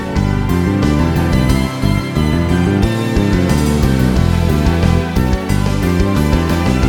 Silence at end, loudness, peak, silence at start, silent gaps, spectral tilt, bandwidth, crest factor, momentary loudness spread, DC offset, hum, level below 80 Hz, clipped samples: 0 s; -14 LUFS; 0 dBFS; 0 s; none; -6.5 dB/octave; 18.5 kHz; 12 dB; 3 LU; under 0.1%; none; -20 dBFS; under 0.1%